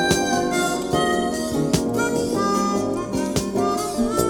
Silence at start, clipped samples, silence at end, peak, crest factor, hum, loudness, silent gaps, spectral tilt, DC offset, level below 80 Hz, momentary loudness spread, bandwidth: 0 s; under 0.1%; 0 s; -4 dBFS; 16 dB; none; -22 LUFS; none; -4.5 dB/octave; under 0.1%; -42 dBFS; 3 LU; 19 kHz